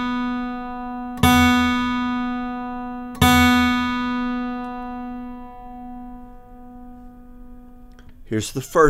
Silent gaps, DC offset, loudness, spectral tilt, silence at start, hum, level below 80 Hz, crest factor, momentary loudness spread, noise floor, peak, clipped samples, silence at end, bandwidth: none; under 0.1%; -21 LUFS; -4.5 dB/octave; 0 s; none; -38 dBFS; 20 dB; 23 LU; -42 dBFS; -2 dBFS; under 0.1%; 0 s; 16 kHz